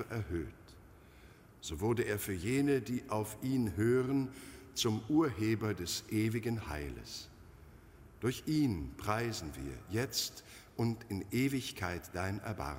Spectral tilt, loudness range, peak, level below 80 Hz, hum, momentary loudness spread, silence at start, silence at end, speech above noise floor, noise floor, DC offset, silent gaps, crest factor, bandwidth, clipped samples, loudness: -5.5 dB/octave; 4 LU; -18 dBFS; -56 dBFS; none; 13 LU; 0 s; 0 s; 23 dB; -58 dBFS; under 0.1%; none; 18 dB; 16 kHz; under 0.1%; -36 LUFS